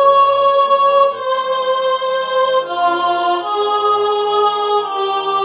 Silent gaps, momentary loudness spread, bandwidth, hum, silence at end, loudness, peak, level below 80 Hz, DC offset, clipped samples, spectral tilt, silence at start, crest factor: none; 5 LU; 4 kHz; none; 0 s; -15 LUFS; -2 dBFS; -68 dBFS; under 0.1%; under 0.1%; -6.5 dB/octave; 0 s; 14 dB